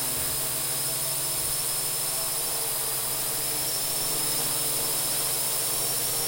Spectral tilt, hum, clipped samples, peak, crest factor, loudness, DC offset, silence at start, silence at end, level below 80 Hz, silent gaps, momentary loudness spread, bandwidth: -0.5 dB/octave; none; under 0.1%; -12 dBFS; 14 dB; -25 LUFS; under 0.1%; 0 s; 0 s; -54 dBFS; none; 2 LU; 16.5 kHz